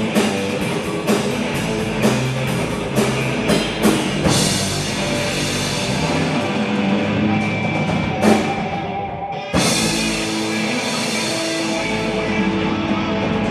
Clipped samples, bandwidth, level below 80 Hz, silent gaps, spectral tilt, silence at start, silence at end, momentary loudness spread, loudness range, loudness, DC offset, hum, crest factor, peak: under 0.1%; 14 kHz; -40 dBFS; none; -4.5 dB/octave; 0 s; 0 s; 5 LU; 1 LU; -19 LUFS; under 0.1%; none; 18 dB; -2 dBFS